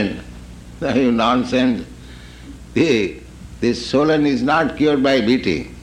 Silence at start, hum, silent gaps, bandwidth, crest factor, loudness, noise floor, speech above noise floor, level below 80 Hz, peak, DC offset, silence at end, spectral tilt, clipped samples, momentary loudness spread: 0 s; 60 Hz at -40 dBFS; none; 10.5 kHz; 14 dB; -18 LUFS; -37 dBFS; 21 dB; -40 dBFS; -4 dBFS; under 0.1%; 0 s; -6 dB/octave; under 0.1%; 23 LU